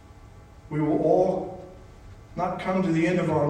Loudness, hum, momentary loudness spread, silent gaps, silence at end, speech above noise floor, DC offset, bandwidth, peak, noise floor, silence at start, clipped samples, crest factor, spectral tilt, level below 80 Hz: -25 LUFS; none; 18 LU; none; 0 s; 24 dB; under 0.1%; 9.6 kHz; -8 dBFS; -48 dBFS; 0.25 s; under 0.1%; 18 dB; -8 dB/octave; -52 dBFS